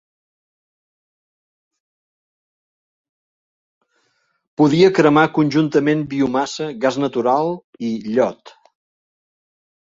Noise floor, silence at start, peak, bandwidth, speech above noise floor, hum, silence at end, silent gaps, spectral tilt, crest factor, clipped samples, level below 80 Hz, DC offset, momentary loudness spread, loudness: -66 dBFS; 4.6 s; -2 dBFS; 7.8 kHz; 50 dB; none; 1.45 s; 7.64-7.73 s; -6.5 dB/octave; 20 dB; under 0.1%; -62 dBFS; under 0.1%; 12 LU; -17 LUFS